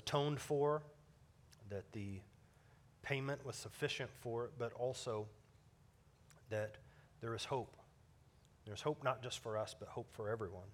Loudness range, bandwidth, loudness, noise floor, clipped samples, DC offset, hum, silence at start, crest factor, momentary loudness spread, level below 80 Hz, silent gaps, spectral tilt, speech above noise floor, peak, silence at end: 4 LU; 17 kHz; -44 LUFS; -68 dBFS; under 0.1%; under 0.1%; none; 0 s; 24 dB; 14 LU; -74 dBFS; none; -5 dB/octave; 26 dB; -22 dBFS; 0 s